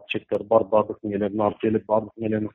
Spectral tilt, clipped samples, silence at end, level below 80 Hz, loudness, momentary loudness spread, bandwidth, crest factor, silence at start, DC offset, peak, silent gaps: -5.5 dB/octave; under 0.1%; 0.05 s; -58 dBFS; -24 LUFS; 7 LU; 4 kHz; 18 dB; 0.1 s; under 0.1%; -4 dBFS; none